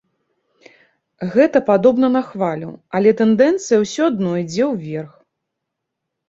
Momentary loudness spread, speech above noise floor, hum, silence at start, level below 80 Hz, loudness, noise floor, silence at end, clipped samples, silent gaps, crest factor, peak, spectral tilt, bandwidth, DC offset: 14 LU; 63 dB; none; 1.2 s; -60 dBFS; -16 LUFS; -79 dBFS; 1.2 s; under 0.1%; none; 16 dB; -2 dBFS; -6 dB/octave; 8 kHz; under 0.1%